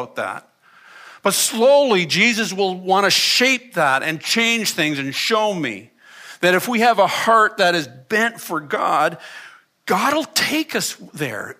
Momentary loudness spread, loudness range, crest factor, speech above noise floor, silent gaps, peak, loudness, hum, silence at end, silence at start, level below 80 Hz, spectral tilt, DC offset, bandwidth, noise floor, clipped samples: 13 LU; 4 LU; 16 dB; 28 dB; none; -2 dBFS; -17 LUFS; none; 0.05 s; 0 s; -72 dBFS; -2.5 dB/octave; under 0.1%; 15.5 kHz; -46 dBFS; under 0.1%